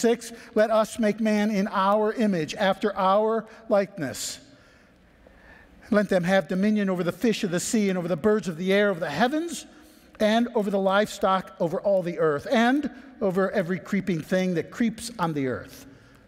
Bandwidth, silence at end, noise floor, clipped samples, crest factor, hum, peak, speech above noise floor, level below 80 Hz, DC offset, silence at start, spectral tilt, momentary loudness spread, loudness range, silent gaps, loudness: 16 kHz; 0.4 s; -56 dBFS; under 0.1%; 16 dB; none; -8 dBFS; 32 dB; -60 dBFS; under 0.1%; 0 s; -5.5 dB/octave; 7 LU; 4 LU; none; -25 LUFS